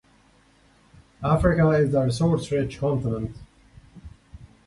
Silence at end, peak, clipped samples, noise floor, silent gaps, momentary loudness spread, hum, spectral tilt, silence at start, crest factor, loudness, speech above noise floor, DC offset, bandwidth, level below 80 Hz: 0.2 s; -6 dBFS; under 0.1%; -58 dBFS; none; 11 LU; none; -7.5 dB/octave; 1.2 s; 20 dB; -23 LUFS; 36 dB; under 0.1%; 11.5 kHz; -40 dBFS